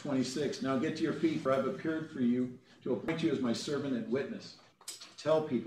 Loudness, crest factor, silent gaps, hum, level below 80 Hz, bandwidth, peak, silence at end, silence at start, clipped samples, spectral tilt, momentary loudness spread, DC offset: -34 LUFS; 16 dB; none; none; -74 dBFS; 13.5 kHz; -18 dBFS; 0 s; 0 s; under 0.1%; -5.5 dB/octave; 13 LU; under 0.1%